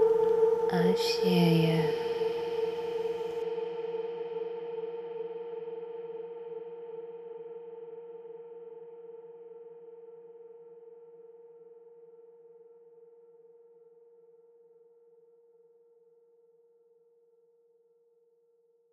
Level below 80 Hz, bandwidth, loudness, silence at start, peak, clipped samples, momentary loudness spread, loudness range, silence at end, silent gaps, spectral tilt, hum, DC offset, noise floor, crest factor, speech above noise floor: -78 dBFS; 13 kHz; -31 LUFS; 0 s; -14 dBFS; under 0.1%; 27 LU; 26 LU; 5.85 s; none; -6.5 dB/octave; none; under 0.1%; -68 dBFS; 20 dB; 43 dB